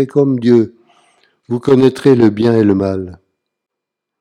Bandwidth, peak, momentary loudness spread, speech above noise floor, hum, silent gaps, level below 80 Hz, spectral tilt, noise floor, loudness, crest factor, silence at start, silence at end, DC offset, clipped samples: 11 kHz; 0 dBFS; 13 LU; 68 dB; none; none; -54 dBFS; -8.5 dB/octave; -80 dBFS; -13 LUFS; 14 dB; 0 s; 1.05 s; under 0.1%; 0.2%